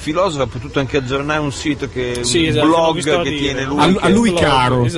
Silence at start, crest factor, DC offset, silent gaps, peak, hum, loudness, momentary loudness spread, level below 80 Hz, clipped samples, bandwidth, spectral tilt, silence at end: 0 s; 14 dB; under 0.1%; none; 0 dBFS; none; -16 LUFS; 8 LU; -36 dBFS; under 0.1%; 11.5 kHz; -5 dB/octave; 0 s